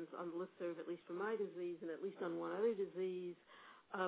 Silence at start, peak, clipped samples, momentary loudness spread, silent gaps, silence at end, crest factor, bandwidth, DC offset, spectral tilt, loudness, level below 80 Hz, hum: 0 s; -28 dBFS; under 0.1%; 11 LU; none; 0 s; 16 dB; 4 kHz; under 0.1%; -5 dB/octave; -45 LUFS; under -90 dBFS; none